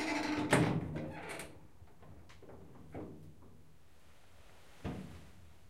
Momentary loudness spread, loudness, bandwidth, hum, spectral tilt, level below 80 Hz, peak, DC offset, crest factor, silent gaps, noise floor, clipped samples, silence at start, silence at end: 27 LU; -37 LUFS; 16 kHz; none; -5.5 dB/octave; -62 dBFS; -14 dBFS; 0.2%; 26 dB; none; -64 dBFS; under 0.1%; 0 s; 0.2 s